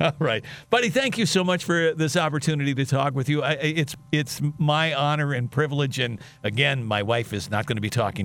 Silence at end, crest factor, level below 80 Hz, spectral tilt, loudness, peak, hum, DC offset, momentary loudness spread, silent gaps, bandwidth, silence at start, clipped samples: 0 s; 20 dB; -58 dBFS; -5 dB/octave; -24 LUFS; -4 dBFS; none; under 0.1%; 6 LU; none; 18.5 kHz; 0 s; under 0.1%